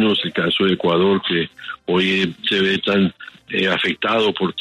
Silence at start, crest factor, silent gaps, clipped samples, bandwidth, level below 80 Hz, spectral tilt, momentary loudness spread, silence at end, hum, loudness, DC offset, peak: 0 s; 14 dB; none; under 0.1%; 10.5 kHz; -58 dBFS; -6 dB/octave; 5 LU; 0 s; none; -18 LUFS; under 0.1%; -6 dBFS